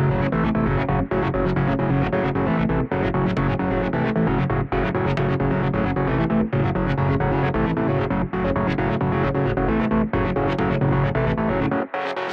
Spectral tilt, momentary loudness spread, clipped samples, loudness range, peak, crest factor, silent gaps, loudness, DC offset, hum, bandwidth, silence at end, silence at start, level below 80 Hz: -9.5 dB/octave; 2 LU; under 0.1%; 0 LU; -8 dBFS; 12 dB; none; -22 LUFS; under 0.1%; none; 5.8 kHz; 0 s; 0 s; -34 dBFS